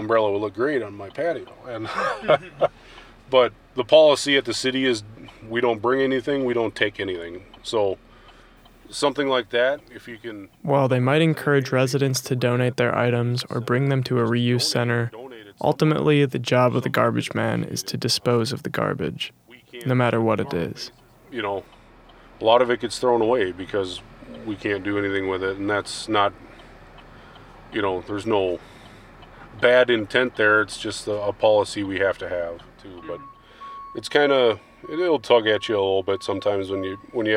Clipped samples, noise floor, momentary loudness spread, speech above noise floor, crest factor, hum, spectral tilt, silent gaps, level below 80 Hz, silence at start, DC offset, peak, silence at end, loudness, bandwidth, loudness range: under 0.1%; -50 dBFS; 15 LU; 28 dB; 20 dB; none; -5 dB/octave; none; -56 dBFS; 0 s; under 0.1%; -2 dBFS; 0 s; -22 LUFS; 16.5 kHz; 5 LU